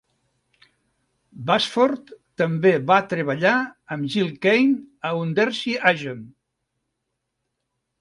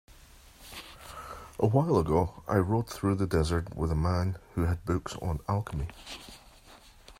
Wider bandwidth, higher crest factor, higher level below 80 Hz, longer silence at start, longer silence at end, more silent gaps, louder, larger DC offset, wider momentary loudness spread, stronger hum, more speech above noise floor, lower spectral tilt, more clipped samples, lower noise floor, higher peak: second, 11.5 kHz vs 16 kHz; about the same, 22 dB vs 20 dB; second, -68 dBFS vs -44 dBFS; first, 1.35 s vs 0.6 s; first, 1.7 s vs 0.05 s; neither; first, -21 LUFS vs -30 LUFS; neither; second, 12 LU vs 18 LU; neither; first, 57 dB vs 26 dB; about the same, -6 dB/octave vs -7 dB/octave; neither; first, -78 dBFS vs -54 dBFS; first, -2 dBFS vs -10 dBFS